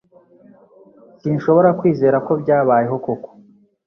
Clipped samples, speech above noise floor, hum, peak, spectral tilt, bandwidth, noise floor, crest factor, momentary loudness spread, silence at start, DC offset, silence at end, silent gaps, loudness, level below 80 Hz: under 0.1%; 34 dB; none; -2 dBFS; -10.5 dB/octave; 6.2 kHz; -50 dBFS; 16 dB; 12 LU; 1.25 s; under 0.1%; 0.6 s; none; -17 LUFS; -60 dBFS